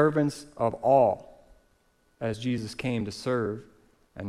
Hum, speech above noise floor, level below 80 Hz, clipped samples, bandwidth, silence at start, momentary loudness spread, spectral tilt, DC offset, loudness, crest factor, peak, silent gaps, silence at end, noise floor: none; 40 dB; -60 dBFS; under 0.1%; 14 kHz; 0 s; 13 LU; -6.5 dB/octave; under 0.1%; -28 LUFS; 18 dB; -10 dBFS; none; 0 s; -67 dBFS